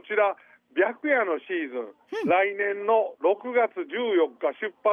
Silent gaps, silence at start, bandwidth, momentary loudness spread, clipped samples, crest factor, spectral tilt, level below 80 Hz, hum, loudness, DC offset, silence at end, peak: none; 0.05 s; 6.6 kHz; 9 LU; under 0.1%; 16 dB; -6 dB/octave; -80 dBFS; none; -26 LUFS; under 0.1%; 0 s; -10 dBFS